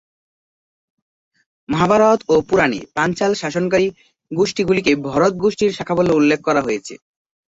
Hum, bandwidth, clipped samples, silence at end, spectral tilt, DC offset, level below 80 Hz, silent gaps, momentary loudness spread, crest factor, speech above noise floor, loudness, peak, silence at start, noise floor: none; 8 kHz; under 0.1%; 0.5 s; -5.5 dB/octave; under 0.1%; -52 dBFS; none; 8 LU; 16 dB; over 73 dB; -17 LUFS; -2 dBFS; 1.7 s; under -90 dBFS